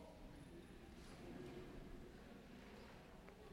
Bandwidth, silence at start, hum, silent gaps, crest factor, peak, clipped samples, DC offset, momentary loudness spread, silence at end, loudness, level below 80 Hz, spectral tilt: 16 kHz; 0 s; none; none; 14 dB; -42 dBFS; under 0.1%; under 0.1%; 5 LU; 0 s; -59 LUFS; -64 dBFS; -6 dB/octave